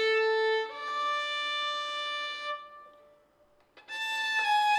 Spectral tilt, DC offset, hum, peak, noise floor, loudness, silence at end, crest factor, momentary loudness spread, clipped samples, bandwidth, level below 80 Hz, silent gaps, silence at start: 1.5 dB/octave; under 0.1%; none; -18 dBFS; -65 dBFS; -30 LUFS; 0 s; 14 dB; 11 LU; under 0.1%; 15 kHz; -82 dBFS; none; 0 s